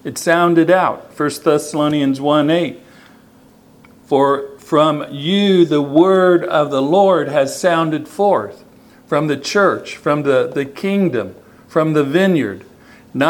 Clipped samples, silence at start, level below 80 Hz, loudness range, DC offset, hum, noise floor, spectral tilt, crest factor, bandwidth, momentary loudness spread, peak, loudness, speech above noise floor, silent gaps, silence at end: under 0.1%; 0.05 s; -62 dBFS; 4 LU; under 0.1%; none; -47 dBFS; -5.5 dB/octave; 16 dB; 18 kHz; 9 LU; 0 dBFS; -15 LUFS; 32 dB; none; 0 s